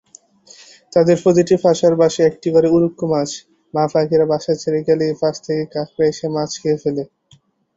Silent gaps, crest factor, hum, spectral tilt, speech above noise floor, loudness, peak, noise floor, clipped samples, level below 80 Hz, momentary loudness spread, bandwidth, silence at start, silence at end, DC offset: none; 16 dB; none; -6 dB/octave; 38 dB; -17 LUFS; -2 dBFS; -54 dBFS; under 0.1%; -56 dBFS; 9 LU; 8 kHz; 0.95 s; 0.7 s; under 0.1%